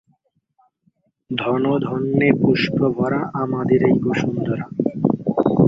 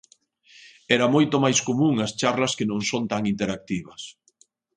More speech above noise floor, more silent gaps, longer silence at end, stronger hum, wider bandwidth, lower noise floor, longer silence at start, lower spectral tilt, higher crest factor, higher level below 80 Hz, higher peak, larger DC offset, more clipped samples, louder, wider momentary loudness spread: first, 46 dB vs 39 dB; neither; second, 0 s vs 0.65 s; neither; second, 7.6 kHz vs 10.5 kHz; about the same, -65 dBFS vs -62 dBFS; first, 1.3 s vs 0.65 s; first, -8 dB/octave vs -4.5 dB/octave; about the same, 18 dB vs 20 dB; first, -52 dBFS vs -60 dBFS; about the same, -2 dBFS vs -4 dBFS; neither; neither; first, -19 LUFS vs -23 LUFS; second, 8 LU vs 12 LU